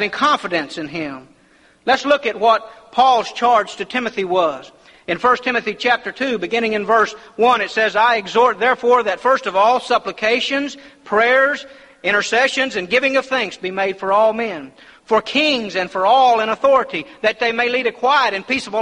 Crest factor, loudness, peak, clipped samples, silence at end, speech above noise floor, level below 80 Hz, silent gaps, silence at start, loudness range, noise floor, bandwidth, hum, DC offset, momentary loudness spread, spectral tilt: 14 dB; -17 LUFS; -2 dBFS; under 0.1%; 0 s; 35 dB; -58 dBFS; none; 0 s; 3 LU; -53 dBFS; 11 kHz; none; under 0.1%; 9 LU; -3 dB/octave